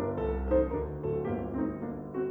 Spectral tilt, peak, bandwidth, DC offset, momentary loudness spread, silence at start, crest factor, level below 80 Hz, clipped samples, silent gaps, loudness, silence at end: -11.5 dB/octave; -14 dBFS; 3.8 kHz; under 0.1%; 7 LU; 0 s; 16 dB; -40 dBFS; under 0.1%; none; -32 LUFS; 0 s